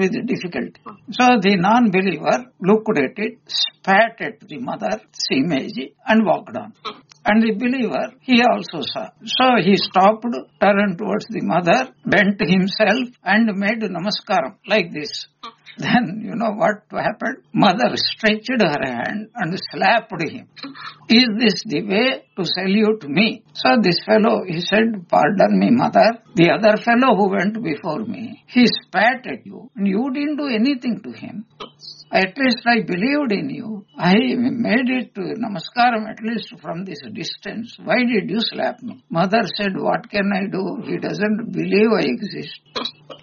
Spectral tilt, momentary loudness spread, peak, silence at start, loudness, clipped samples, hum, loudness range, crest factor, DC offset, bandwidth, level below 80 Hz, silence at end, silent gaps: -3.5 dB/octave; 14 LU; 0 dBFS; 0 s; -18 LUFS; under 0.1%; none; 5 LU; 18 dB; under 0.1%; 7.2 kHz; -60 dBFS; 0.05 s; none